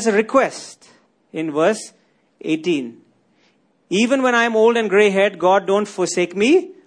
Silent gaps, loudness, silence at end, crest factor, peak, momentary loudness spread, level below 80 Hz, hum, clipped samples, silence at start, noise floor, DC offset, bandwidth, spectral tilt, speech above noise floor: none; -17 LUFS; 0.15 s; 16 dB; -2 dBFS; 16 LU; -68 dBFS; none; under 0.1%; 0 s; -60 dBFS; under 0.1%; 10.5 kHz; -4 dB/octave; 43 dB